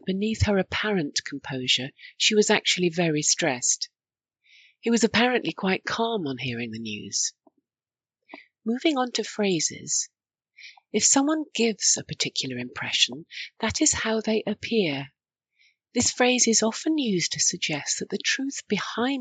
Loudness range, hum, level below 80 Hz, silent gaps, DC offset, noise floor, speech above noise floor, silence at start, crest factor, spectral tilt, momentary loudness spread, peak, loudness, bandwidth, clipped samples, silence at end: 5 LU; none; -56 dBFS; none; under 0.1%; under -90 dBFS; over 65 dB; 0.05 s; 22 dB; -2.5 dB/octave; 11 LU; -4 dBFS; -24 LUFS; 9.4 kHz; under 0.1%; 0 s